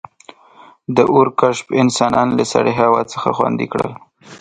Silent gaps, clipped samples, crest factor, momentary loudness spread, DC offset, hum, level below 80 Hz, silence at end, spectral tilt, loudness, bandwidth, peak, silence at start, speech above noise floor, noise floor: none; under 0.1%; 16 dB; 8 LU; under 0.1%; none; -54 dBFS; 0.05 s; -5.5 dB/octave; -16 LUFS; 9.6 kHz; 0 dBFS; 0.9 s; 30 dB; -45 dBFS